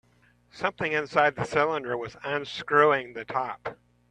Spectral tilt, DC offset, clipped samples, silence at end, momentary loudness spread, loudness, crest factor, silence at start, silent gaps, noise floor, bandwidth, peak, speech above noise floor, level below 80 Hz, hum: -5 dB/octave; under 0.1%; under 0.1%; 0.35 s; 12 LU; -26 LUFS; 22 dB; 0.55 s; none; -63 dBFS; 9.8 kHz; -6 dBFS; 36 dB; -62 dBFS; none